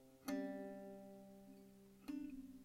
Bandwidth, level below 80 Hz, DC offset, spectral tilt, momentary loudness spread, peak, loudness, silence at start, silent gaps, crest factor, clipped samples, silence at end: 16 kHz; -74 dBFS; under 0.1%; -5.5 dB/octave; 16 LU; -32 dBFS; -51 LUFS; 0 s; none; 20 dB; under 0.1%; 0 s